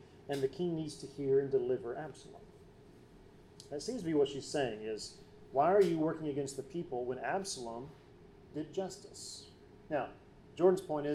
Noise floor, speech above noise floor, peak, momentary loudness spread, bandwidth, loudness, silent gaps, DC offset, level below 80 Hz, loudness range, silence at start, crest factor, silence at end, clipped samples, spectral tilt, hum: -58 dBFS; 23 dB; -16 dBFS; 17 LU; 13 kHz; -36 LUFS; none; under 0.1%; -66 dBFS; 7 LU; 0 s; 20 dB; 0 s; under 0.1%; -5.5 dB/octave; none